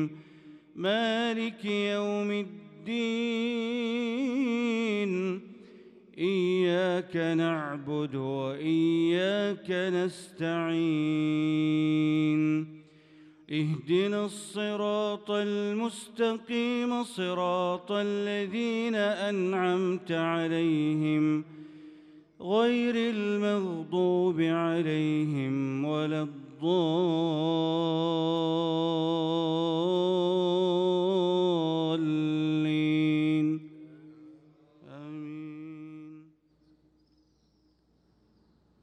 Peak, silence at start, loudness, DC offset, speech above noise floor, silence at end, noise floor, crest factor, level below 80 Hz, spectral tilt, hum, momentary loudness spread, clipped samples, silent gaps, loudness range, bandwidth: -16 dBFS; 0 s; -29 LUFS; under 0.1%; 40 dB; 2.6 s; -68 dBFS; 14 dB; -78 dBFS; -6.5 dB/octave; none; 8 LU; under 0.1%; none; 4 LU; 11 kHz